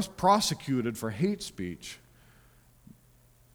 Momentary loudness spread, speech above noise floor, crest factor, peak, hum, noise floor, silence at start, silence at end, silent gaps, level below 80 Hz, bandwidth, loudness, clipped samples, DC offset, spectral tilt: 19 LU; 32 dB; 22 dB; -10 dBFS; none; -61 dBFS; 0 s; 1.6 s; none; -60 dBFS; over 20 kHz; -29 LUFS; under 0.1%; under 0.1%; -4.5 dB/octave